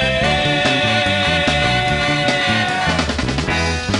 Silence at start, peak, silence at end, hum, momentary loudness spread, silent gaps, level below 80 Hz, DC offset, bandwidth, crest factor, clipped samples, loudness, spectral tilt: 0 s; -4 dBFS; 0 s; none; 3 LU; none; -32 dBFS; under 0.1%; 11 kHz; 12 dB; under 0.1%; -16 LUFS; -4 dB/octave